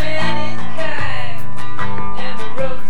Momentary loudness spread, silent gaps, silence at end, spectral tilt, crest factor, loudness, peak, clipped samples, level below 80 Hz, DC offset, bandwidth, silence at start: 7 LU; none; 0 s; -5.5 dB/octave; 16 dB; -25 LUFS; -2 dBFS; under 0.1%; -44 dBFS; 40%; 19.5 kHz; 0 s